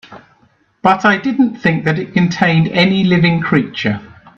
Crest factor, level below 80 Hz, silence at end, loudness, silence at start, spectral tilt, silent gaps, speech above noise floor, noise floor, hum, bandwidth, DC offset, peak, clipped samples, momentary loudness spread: 14 dB; -50 dBFS; 0.3 s; -14 LUFS; 0.1 s; -7 dB/octave; none; 41 dB; -55 dBFS; none; 7.2 kHz; under 0.1%; 0 dBFS; under 0.1%; 6 LU